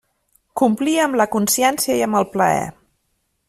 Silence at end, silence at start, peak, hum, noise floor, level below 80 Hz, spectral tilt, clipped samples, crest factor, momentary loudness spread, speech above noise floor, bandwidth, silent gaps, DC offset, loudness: 0.75 s; 0.55 s; -4 dBFS; none; -69 dBFS; -58 dBFS; -3.5 dB/octave; under 0.1%; 16 dB; 5 LU; 52 dB; 16 kHz; none; under 0.1%; -18 LUFS